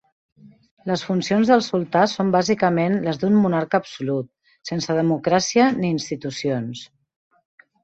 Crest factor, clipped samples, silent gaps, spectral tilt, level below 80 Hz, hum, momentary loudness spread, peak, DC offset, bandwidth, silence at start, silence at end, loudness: 18 dB; under 0.1%; 0.71-0.77 s; -5.5 dB/octave; -60 dBFS; none; 11 LU; -4 dBFS; under 0.1%; 8.2 kHz; 0.45 s; 1 s; -21 LUFS